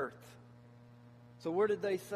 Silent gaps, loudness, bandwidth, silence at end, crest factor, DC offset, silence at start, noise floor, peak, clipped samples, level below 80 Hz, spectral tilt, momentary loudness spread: none; -35 LUFS; 15 kHz; 0 s; 18 dB; under 0.1%; 0 s; -58 dBFS; -20 dBFS; under 0.1%; -78 dBFS; -6 dB/octave; 26 LU